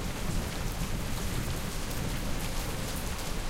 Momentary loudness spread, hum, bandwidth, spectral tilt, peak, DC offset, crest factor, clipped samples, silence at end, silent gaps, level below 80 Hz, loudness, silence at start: 1 LU; none; 17 kHz; -4 dB/octave; -20 dBFS; under 0.1%; 12 dB; under 0.1%; 0 s; none; -36 dBFS; -35 LUFS; 0 s